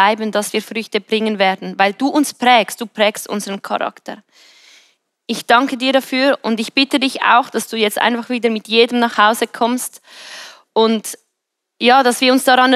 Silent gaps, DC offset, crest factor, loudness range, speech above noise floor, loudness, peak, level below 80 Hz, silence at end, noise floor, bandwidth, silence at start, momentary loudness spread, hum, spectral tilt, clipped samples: none; under 0.1%; 16 dB; 4 LU; 61 dB; -15 LUFS; 0 dBFS; -80 dBFS; 0 s; -76 dBFS; 15 kHz; 0 s; 13 LU; none; -3 dB/octave; under 0.1%